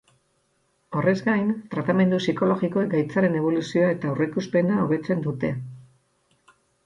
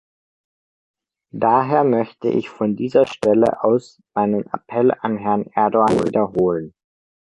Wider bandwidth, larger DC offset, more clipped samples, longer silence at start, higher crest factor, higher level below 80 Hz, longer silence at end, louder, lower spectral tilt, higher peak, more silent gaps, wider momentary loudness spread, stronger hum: second, 7.6 kHz vs 11.5 kHz; neither; neither; second, 0.9 s vs 1.35 s; about the same, 16 dB vs 16 dB; second, -62 dBFS vs -56 dBFS; first, 1.05 s vs 0.65 s; second, -23 LUFS vs -19 LUFS; about the same, -7.5 dB/octave vs -7.5 dB/octave; second, -8 dBFS vs -2 dBFS; neither; about the same, 6 LU vs 8 LU; neither